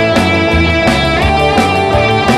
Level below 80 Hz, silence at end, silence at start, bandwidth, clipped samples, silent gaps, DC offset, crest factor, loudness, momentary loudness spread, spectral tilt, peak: -22 dBFS; 0 s; 0 s; 14 kHz; under 0.1%; none; under 0.1%; 10 dB; -10 LUFS; 1 LU; -5.5 dB/octave; 0 dBFS